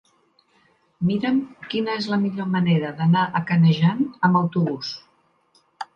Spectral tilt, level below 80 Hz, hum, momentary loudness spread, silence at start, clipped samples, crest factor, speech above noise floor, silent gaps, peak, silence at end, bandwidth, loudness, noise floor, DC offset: -8 dB/octave; -66 dBFS; none; 10 LU; 1 s; under 0.1%; 18 dB; 42 dB; none; -4 dBFS; 0.1 s; 6.6 kHz; -21 LUFS; -62 dBFS; under 0.1%